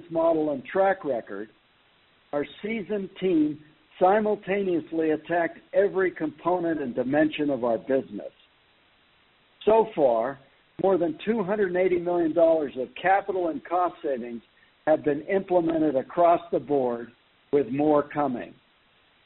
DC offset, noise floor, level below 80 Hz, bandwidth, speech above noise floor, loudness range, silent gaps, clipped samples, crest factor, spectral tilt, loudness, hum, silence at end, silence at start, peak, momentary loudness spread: under 0.1%; -62 dBFS; -62 dBFS; 4.2 kHz; 38 dB; 3 LU; none; under 0.1%; 18 dB; -5 dB/octave; -25 LUFS; none; 0.75 s; 0 s; -8 dBFS; 11 LU